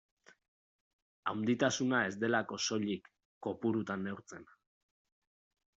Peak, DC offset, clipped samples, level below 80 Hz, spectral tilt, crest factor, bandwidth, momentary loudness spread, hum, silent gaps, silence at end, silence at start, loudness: -16 dBFS; under 0.1%; under 0.1%; -78 dBFS; -3.5 dB/octave; 22 dB; 8 kHz; 12 LU; none; 3.25-3.41 s; 1.35 s; 1.25 s; -35 LUFS